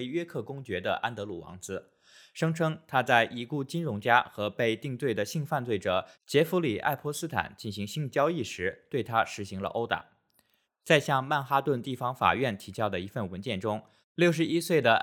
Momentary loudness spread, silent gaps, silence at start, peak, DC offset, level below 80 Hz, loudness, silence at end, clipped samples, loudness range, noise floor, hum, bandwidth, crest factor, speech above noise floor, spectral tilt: 11 LU; 14.04-14.15 s; 0 s; -6 dBFS; under 0.1%; -70 dBFS; -29 LUFS; 0 s; under 0.1%; 3 LU; -71 dBFS; none; over 20 kHz; 24 dB; 42 dB; -5 dB/octave